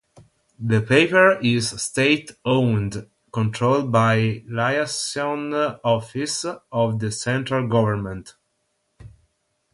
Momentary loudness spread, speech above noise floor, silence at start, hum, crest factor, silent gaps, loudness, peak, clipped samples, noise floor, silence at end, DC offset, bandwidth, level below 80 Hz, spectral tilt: 11 LU; 51 dB; 0.15 s; none; 20 dB; none; -21 LUFS; -2 dBFS; under 0.1%; -72 dBFS; 0.65 s; under 0.1%; 11.5 kHz; -54 dBFS; -5 dB/octave